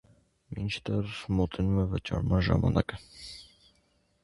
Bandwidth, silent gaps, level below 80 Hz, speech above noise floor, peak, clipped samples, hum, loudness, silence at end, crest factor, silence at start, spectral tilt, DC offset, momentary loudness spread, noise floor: 11.5 kHz; none; -42 dBFS; 41 dB; -10 dBFS; under 0.1%; none; -30 LUFS; 0.8 s; 22 dB; 0.5 s; -7.5 dB/octave; under 0.1%; 18 LU; -70 dBFS